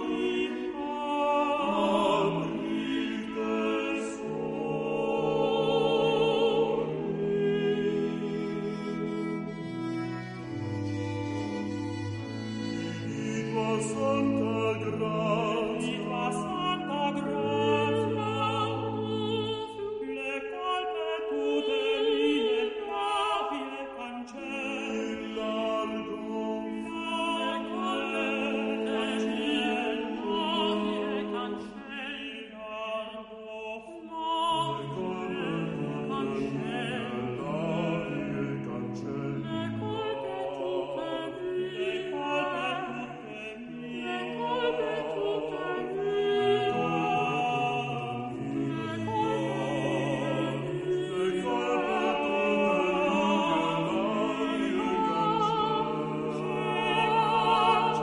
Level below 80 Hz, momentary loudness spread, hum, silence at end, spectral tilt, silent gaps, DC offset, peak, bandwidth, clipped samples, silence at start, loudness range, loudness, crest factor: -62 dBFS; 9 LU; none; 0 s; -6 dB/octave; none; under 0.1%; -12 dBFS; 11 kHz; under 0.1%; 0 s; 6 LU; -30 LUFS; 18 dB